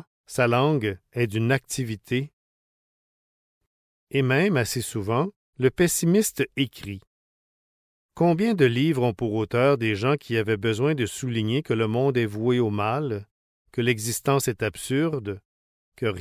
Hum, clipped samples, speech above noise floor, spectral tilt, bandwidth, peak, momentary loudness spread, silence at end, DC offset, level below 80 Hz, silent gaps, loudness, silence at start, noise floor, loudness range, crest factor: none; under 0.1%; over 67 dB; -5.5 dB/octave; 16 kHz; -8 dBFS; 9 LU; 0 s; under 0.1%; -54 dBFS; 2.33-3.61 s, 3.67-4.07 s, 5.36-5.53 s, 7.07-8.09 s, 13.31-13.65 s, 15.45-15.92 s; -24 LUFS; 0.3 s; under -90 dBFS; 5 LU; 18 dB